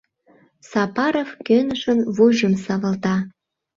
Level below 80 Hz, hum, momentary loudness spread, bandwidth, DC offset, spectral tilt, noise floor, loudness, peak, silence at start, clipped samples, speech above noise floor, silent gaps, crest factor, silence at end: -60 dBFS; none; 9 LU; 7.6 kHz; under 0.1%; -6.5 dB/octave; -56 dBFS; -20 LUFS; -4 dBFS; 0.7 s; under 0.1%; 37 dB; none; 16 dB; 0.5 s